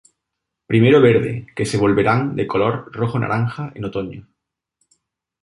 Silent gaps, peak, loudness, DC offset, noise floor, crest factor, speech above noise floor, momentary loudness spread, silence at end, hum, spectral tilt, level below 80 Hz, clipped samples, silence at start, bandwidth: none; -2 dBFS; -18 LUFS; under 0.1%; -80 dBFS; 18 dB; 63 dB; 14 LU; 1.25 s; none; -7 dB/octave; -50 dBFS; under 0.1%; 0.7 s; 11.5 kHz